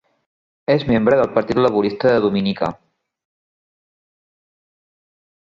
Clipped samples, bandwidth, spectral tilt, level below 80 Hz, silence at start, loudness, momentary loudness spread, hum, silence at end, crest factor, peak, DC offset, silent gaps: under 0.1%; 7.4 kHz; -8 dB/octave; -50 dBFS; 0.7 s; -17 LUFS; 8 LU; none; 2.85 s; 18 dB; -2 dBFS; under 0.1%; none